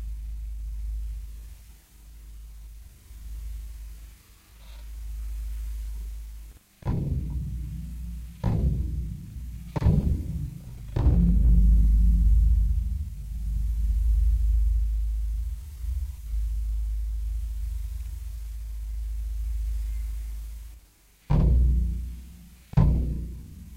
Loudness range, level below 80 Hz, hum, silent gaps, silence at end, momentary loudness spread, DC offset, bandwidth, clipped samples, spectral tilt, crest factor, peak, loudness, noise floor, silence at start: 17 LU; -26 dBFS; none; none; 0 s; 21 LU; under 0.1%; 4.3 kHz; under 0.1%; -8.5 dB/octave; 18 dB; -8 dBFS; -28 LUFS; -57 dBFS; 0 s